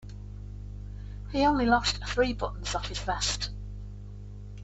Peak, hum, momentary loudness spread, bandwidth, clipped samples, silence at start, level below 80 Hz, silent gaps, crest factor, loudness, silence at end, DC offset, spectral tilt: -10 dBFS; 50 Hz at -35 dBFS; 19 LU; 8.4 kHz; under 0.1%; 0 s; -40 dBFS; none; 20 dB; -28 LUFS; 0 s; under 0.1%; -4 dB/octave